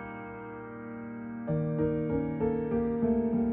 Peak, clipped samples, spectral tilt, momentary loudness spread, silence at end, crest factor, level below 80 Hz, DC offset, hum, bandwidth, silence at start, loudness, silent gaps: -16 dBFS; under 0.1%; -10 dB/octave; 13 LU; 0 s; 14 dB; -52 dBFS; under 0.1%; none; 3.3 kHz; 0 s; -31 LUFS; none